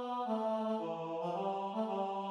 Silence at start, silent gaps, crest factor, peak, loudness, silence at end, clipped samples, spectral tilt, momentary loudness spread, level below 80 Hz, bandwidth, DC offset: 0 s; none; 12 dB; -24 dBFS; -37 LUFS; 0 s; under 0.1%; -7 dB/octave; 3 LU; under -90 dBFS; 9.8 kHz; under 0.1%